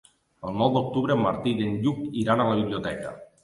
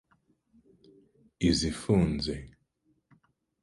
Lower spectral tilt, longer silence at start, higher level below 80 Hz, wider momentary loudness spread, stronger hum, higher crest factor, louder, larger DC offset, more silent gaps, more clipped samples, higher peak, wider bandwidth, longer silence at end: first, -7.5 dB/octave vs -5.5 dB/octave; second, 0.45 s vs 1.4 s; second, -56 dBFS vs -46 dBFS; about the same, 11 LU vs 9 LU; neither; about the same, 18 dB vs 20 dB; first, -25 LUFS vs -29 LUFS; neither; neither; neither; first, -6 dBFS vs -12 dBFS; about the same, 11.5 kHz vs 11.5 kHz; second, 0.2 s vs 1.15 s